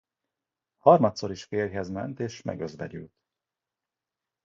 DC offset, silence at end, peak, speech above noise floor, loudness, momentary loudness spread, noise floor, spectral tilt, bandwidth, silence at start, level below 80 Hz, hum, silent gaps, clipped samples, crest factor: under 0.1%; 1.4 s; -4 dBFS; 63 dB; -26 LUFS; 18 LU; -89 dBFS; -6.5 dB/octave; 7.6 kHz; 0.85 s; -60 dBFS; none; none; under 0.1%; 24 dB